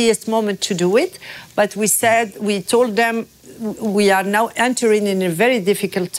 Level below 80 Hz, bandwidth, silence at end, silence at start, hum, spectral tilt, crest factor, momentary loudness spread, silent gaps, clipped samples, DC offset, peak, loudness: -60 dBFS; 16 kHz; 0 s; 0 s; none; -3.5 dB/octave; 12 dB; 10 LU; none; under 0.1%; under 0.1%; -4 dBFS; -17 LUFS